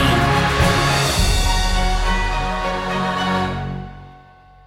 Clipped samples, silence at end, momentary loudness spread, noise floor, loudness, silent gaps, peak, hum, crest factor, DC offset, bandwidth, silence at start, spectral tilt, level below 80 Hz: under 0.1%; 0.5 s; 9 LU; -46 dBFS; -19 LUFS; none; -4 dBFS; none; 14 dB; under 0.1%; 16.5 kHz; 0 s; -4 dB/octave; -24 dBFS